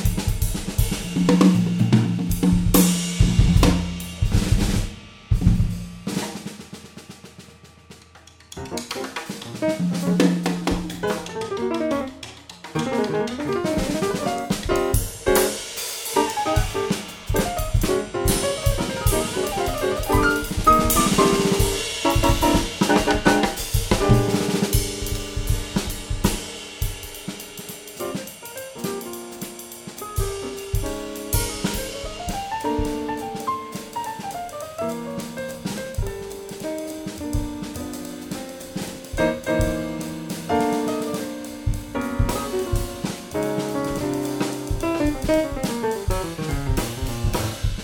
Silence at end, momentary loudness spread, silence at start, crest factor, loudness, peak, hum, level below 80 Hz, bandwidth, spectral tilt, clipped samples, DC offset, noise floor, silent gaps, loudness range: 0 s; 14 LU; 0 s; 22 dB; -23 LUFS; -2 dBFS; none; -30 dBFS; over 20 kHz; -5 dB/octave; under 0.1%; under 0.1%; -48 dBFS; none; 11 LU